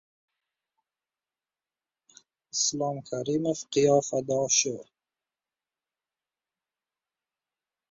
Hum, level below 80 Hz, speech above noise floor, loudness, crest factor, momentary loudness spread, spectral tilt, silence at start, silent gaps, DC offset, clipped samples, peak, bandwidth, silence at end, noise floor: none; -72 dBFS; over 63 dB; -26 LUFS; 22 dB; 10 LU; -3 dB/octave; 2.55 s; none; under 0.1%; under 0.1%; -8 dBFS; 7.8 kHz; 3.1 s; under -90 dBFS